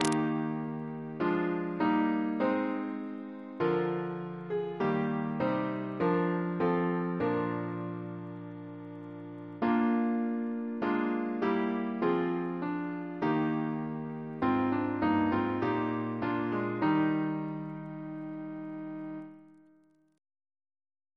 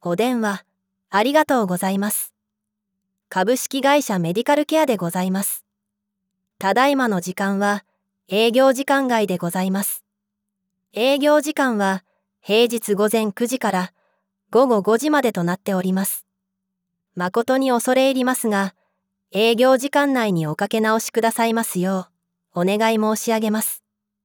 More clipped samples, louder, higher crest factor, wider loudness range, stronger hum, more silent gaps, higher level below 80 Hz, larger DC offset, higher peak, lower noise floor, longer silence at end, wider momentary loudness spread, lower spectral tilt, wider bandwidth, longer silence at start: neither; second, -32 LUFS vs -20 LUFS; first, 22 dB vs 16 dB; about the same, 4 LU vs 2 LU; neither; neither; first, -68 dBFS vs -76 dBFS; neither; second, -10 dBFS vs -4 dBFS; second, -65 dBFS vs -80 dBFS; first, 1.65 s vs 0.45 s; first, 12 LU vs 8 LU; first, -7 dB/octave vs -4.5 dB/octave; second, 11 kHz vs over 20 kHz; about the same, 0 s vs 0.05 s